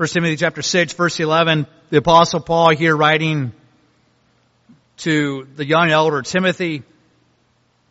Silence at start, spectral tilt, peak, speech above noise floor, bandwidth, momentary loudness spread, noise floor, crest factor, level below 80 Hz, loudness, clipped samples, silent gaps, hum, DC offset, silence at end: 0 s; -3.5 dB/octave; 0 dBFS; 44 dB; 8 kHz; 11 LU; -61 dBFS; 18 dB; -52 dBFS; -16 LUFS; under 0.1%; none; none; under 0.1%; 1.1 s